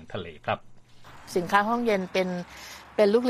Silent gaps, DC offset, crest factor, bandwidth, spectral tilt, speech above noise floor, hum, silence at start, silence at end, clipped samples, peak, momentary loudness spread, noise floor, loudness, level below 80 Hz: none; under 0.1%; 22 dB; 15 kHz; -5.5 dB/octave; 22 dB; none; 0 s; 0 s; under 0.1%; -6 dBFS; 16 LU; -47 dBFS; -27 LUFS; -58 dBFS